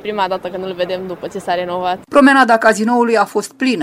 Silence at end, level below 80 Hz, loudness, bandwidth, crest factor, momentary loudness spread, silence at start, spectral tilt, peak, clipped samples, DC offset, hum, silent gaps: 0 s; -54 dBFS; -15 LUFS; 15.5 kHz; 14 dB; 13 LU; 0.05 s; -4.5 dB/octave; 0 dBFS; under 0.1%; under 0.1%; none; none